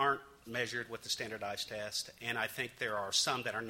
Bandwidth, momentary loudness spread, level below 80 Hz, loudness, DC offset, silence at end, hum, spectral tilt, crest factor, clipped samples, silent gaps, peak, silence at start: 16 kHz; 8 LU; -72 dBFS; -36 LUFS; under 0.1%; 0 s; none; -1.5 dB/octave; 20 dB; under 0.1%; none; -18 dBFS; 0 s